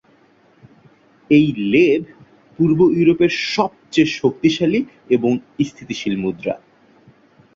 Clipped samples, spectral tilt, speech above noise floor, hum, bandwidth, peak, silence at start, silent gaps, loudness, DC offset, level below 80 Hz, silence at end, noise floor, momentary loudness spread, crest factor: under 0.1%; -6.5 dB/octave; 37 dB; none; 7.6 kHz; -2 dBFS; 1.3 s; none; -17 LUFS; under 0.1%; -56 dBFS; 1 s; -54 dBFS; 10 LU; 16 dB